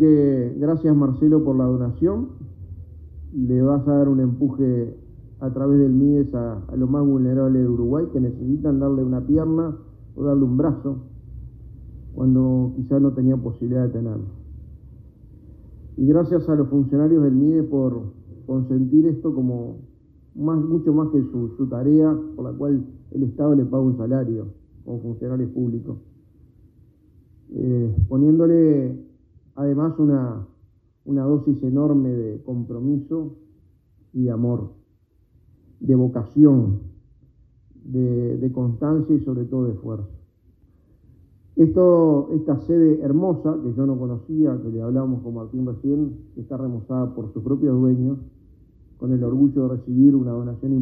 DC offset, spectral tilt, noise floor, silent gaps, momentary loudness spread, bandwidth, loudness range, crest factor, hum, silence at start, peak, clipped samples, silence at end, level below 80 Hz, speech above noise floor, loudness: under 0.1%; -14.5 dB/octave; -60 dBFS; none; 16 LU; 2 kHz; 5 LU; 18 dB; none; 0 s; -2 dBFS; under 0.1%; 0 s; -44 dBFS; 40 dB; -20 LUFS